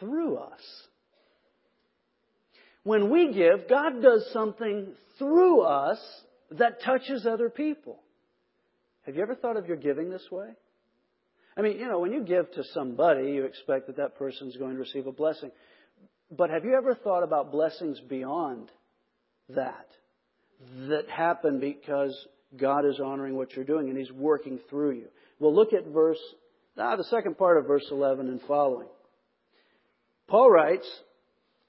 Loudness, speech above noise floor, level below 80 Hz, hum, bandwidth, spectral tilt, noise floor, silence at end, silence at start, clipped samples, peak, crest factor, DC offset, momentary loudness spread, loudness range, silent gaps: -27 LUFS; 49 dB; -82 dBFS; none; 5.8 kHz; -10 dB/octave; -75 dBFS; 0.7 s; 0 s; under 0.1%; -6 dBFS; 22 dB; under 0.1%; 16 LU; 9 LU; none